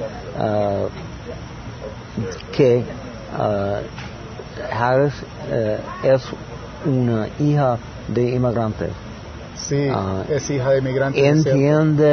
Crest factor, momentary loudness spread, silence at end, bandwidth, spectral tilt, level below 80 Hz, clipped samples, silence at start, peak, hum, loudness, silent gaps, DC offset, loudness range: 18 dB; 17 LU; 0 s; 6.6 kHz; -7 dB/octave; -42 dBFS; under 0.1%; 0 s; -2 dBFS; none; -20 LUFS; none; under 0.1%; 3 LU